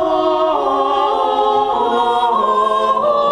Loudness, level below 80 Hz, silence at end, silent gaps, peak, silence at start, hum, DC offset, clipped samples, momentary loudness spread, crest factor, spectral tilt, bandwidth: -15 LUFS; -50 dBFS; 0 s; none; -4 dBFS; 0 s; none; under 0.1%; under 0.1%; 1 LU; 12 dB; -4.5 dB/octave; 11 kHz